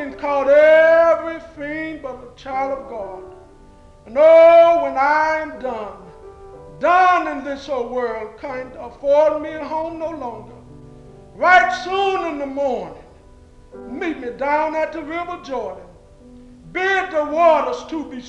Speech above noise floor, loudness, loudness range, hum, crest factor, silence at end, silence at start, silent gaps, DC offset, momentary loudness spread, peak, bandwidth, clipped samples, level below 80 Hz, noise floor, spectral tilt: 28 dB; -17 LUFS; 9 LU; none; 16 dB; 0 s; 0 s; none; under 0.1%; 19 LU; -2 dBFS; 8 kHz; under 0.1%; -50 dBFS; -45 dBFS; -4.5 dB/octave